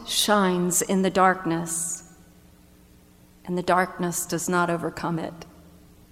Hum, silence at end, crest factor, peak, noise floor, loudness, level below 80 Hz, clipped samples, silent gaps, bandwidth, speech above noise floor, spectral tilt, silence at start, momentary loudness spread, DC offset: none; 0.6 s; 20 dB; -6 dBFS; -53 dBFS; -24 LUFS; -56 dBFS; under 0.1%; none; 16.5 kHz; 30 dB; -3.5 dB/octave; 0 s; 12 LU; under 0.1%